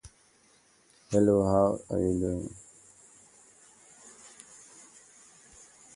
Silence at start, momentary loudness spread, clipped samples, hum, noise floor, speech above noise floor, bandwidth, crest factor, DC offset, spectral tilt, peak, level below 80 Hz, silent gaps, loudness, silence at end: 0.05 s; 28 LU; under 0.1%; none; -63 dBFS; 37 dB; 11.5 kHz; 22 dB; under 0.1%; -7.5 dB/octave; -10 dBFS; -52 dBFS; none; -27 LUFS; 1.7 s